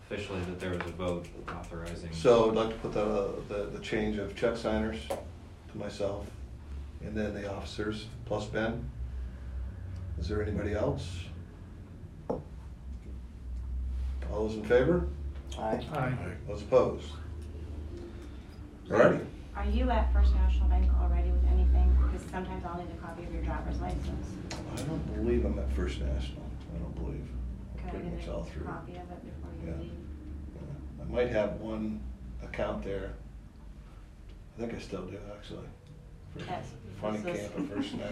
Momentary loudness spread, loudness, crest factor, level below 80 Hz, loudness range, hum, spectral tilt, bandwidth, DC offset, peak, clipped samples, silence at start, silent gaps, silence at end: 18 LU; -33 LUFS; 22 dB; -36 dBFS; 11 LU; none; -7 dB/octave; 11 kHz; under 0.1%; -10 dBFS; under 0.1%; 0 s; none; 0 s